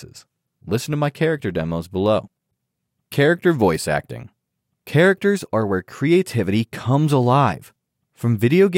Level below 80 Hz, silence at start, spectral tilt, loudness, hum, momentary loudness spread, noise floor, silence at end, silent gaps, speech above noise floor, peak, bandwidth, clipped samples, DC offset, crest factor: -52 dBFS; 0 s; -6.5 dB/octave; -19 LUFS; none; 9 LU; -77 dBFS; 0 s; none; 58 dB; -4 dBFS; 16.5 kHz; under 0.1%; under 0.1%; 16 dB